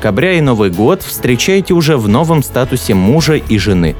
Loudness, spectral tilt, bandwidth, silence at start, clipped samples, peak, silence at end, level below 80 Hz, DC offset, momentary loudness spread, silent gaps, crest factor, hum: -11 LUFS; -5.5 dB/octave; over 20 kHz; 0 s; under 0.1%; 0 dBFS; 0 s; -30 dBFS; under 0.1%; 3 LU; none; 10 dB; none